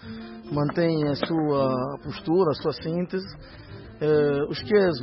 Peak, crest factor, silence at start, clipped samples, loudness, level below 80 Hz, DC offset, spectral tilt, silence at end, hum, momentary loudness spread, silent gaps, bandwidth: -8 dBFS; 16 dB; 0 s; under 0.1%; -25 LUFS; -52 dBFS; under 0.1%; -11 dB/octave; 0 s; none; 18 LU; none; 5.8 kHz